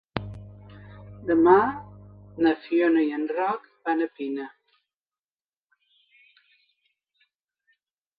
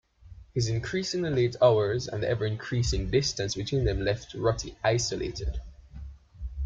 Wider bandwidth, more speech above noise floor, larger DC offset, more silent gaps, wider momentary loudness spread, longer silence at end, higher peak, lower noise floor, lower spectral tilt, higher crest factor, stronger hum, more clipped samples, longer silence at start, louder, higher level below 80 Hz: second, 5 kHz vs 7.8 kHz; first, over 68 dB vs 23 dB; neither; neither; first, 27 LU vs 19 LU; first, 3.7 s vs 0 s; first, -6 dBFS vs -10 dBFS; first, under -90 dBFS vs -50 dBFS; first, -10 dB/octave vs -5 dB/octave; about the same, 22 dB vs 18 dB; neither; neither; about the same, 0.15 s vs 0.25 s; first, -24 LUFS vs -28 LUFS; second, -58 dBFS vs -40 dBFS